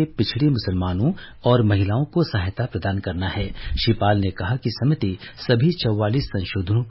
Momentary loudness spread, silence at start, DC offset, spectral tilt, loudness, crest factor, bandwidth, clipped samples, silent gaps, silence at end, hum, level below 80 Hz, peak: 7 LU; 0 s; under 0.1%; -11 dB/octave; -22 LUFS; 16 dB; 5.8 kHz; under 0.1%; none; 0 s; none; -36 dBFS; -6 dBFS